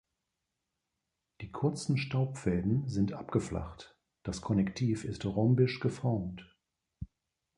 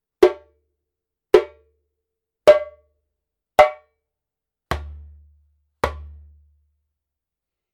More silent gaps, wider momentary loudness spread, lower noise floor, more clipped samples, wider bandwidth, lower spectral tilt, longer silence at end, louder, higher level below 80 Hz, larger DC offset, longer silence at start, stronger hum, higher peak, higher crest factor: neither; about the same, 20 LU vs 22 LU; about the same, -86 dBFS vs -86 dBFS; neither; second, 11 kHz vs 15.5 kHz; first, -7 dB/octave vs -5.5 dB/octave; second, 0.5 s vs 1.7 s; second, -32 LUFS vs -19 LUFS; second, -54 dBFS vs -44 dBFS; neither; first, 1.4 s vs 0.2 s; neither; second, -14 dBFS vs 0 dBFS; second, 18 dB vs 24 dB